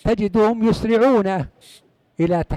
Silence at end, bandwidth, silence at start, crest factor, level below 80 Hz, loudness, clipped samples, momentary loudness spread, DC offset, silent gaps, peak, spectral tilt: 0 s; 12 kHz; 0.05 s; 12 dB; -38 dBFS; -18 LUFS; under 0.1%; 9 LU; under 0.1%; none; -8 dBFS; -7.5 dB/octave